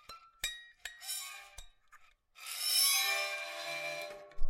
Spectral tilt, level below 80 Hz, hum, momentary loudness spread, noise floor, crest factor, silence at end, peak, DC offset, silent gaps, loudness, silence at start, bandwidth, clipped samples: 1.5 dB/octave; -48 dBFS; none; 22 LU; -62 dBFS; 18 dB; 0 s; -18 dBFS; under 0.1%; none; -33 LUFS; 0.1 s; 16.5 kHz; under 0.1%